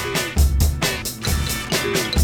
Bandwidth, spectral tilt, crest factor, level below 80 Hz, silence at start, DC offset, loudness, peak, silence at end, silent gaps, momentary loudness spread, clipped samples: over 20 kHz; -4 dB/octave; 16 dB; -24 dBFS; 0 s; under 0.1%; -21 LUFS; -4 dBFS; 0 s; none; 4 LU; under 0.1%